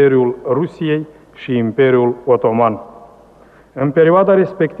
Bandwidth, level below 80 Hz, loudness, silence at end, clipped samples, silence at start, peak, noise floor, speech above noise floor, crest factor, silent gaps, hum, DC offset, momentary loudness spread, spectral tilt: 4.5 kHz; -56 dBFS; -14 LUFS; 0 s; under 0.1%; 0 s; -2 dBFS; -45 dBFS; 31 dB; 12 dB; none; none; under 0.1%; 11 LU; -9.5 dB/octave